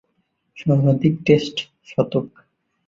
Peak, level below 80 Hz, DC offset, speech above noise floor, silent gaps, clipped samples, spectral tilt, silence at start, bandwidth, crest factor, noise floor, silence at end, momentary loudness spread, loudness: -2 dBFS; -56 dBFS; under 0.1%; 51 dB; none; under 0.1%; -7.5 dB/octave; 0.55 s; 7.6 kHz; 18 dB; -70 dBFS; 0.6 s; 11 LU; -20 LUFS